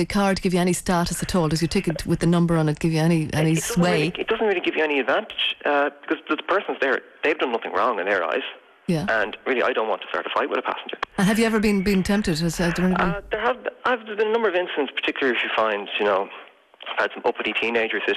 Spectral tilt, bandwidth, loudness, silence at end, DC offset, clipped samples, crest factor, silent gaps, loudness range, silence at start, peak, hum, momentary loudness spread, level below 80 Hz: -5 dB/octave; 14 kHz; -22 LUFS; 0 s; under 0.1%; under 0.1%; 12 dB; none; 2 LU; 0 s; -10 dBFS; none; 5 LU; -44 dBFS